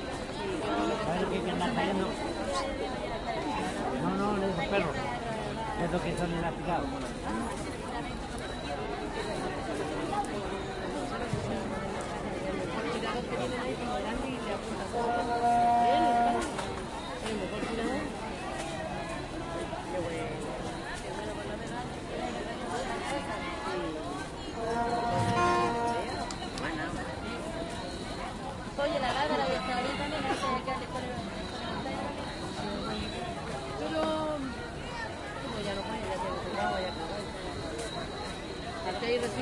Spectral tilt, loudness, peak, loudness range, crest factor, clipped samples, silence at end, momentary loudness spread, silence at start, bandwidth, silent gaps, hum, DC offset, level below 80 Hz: -5 dB/octave; -33 LUFS; -16 dBFS; 6 LU; 18 dB; under 0.1%; 0 s; 8 LU; 0 s; 11.5 kHz; none; none; under 0.1%; -48 dBFS